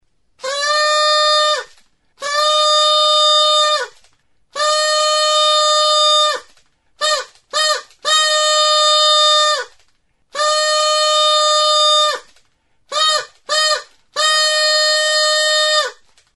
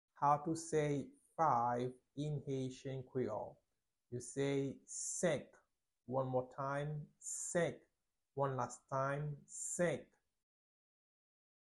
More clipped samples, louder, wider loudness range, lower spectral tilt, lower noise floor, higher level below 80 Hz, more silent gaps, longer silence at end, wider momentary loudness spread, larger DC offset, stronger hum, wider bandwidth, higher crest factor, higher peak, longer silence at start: neither; first, -13 LUFS vs -40 LUFS; about the same, 2 LU vs 3 LU; second, 4.5 dB/octave vs -5 dB/octave; second, -58 dBFS vs -82 dBFS; first, -66 dBFS vs -74 dBFS; neither; second, 0.4 s vs 1.7 s; about the same, 11 LU vs 11 LU; neither; neither; about the same, 11.5 kHz vs 12 kHz; about the same, 16 dB vs 20 dB; first, 0 dBFS vs -20 dBFS; first, 0.45 s vs 0.15 s